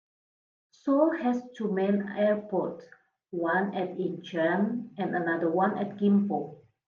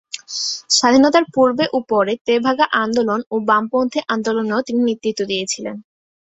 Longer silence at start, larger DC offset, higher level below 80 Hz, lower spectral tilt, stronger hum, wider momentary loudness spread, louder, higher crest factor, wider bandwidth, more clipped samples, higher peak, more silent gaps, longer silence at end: first, 0.85 s vs 0.15 s; neither; second, -80 dBFS vs -60 dBFS; first, -8.5 dB/octave vs -3 dB/octave; neither; about the same, 9 LU vs 9 LU; second, -28 LUFS vs -17 LUFS; about the same, 18 dB vs 16 dB; second, 6.6 kHz vs 8.4 kHz; neither; second, -10 dBFS vs -2 dBFS; second, none vs 2.21-2.25 s, 3.26-3.31 s; about the same, 0.35 s vs 0.4 s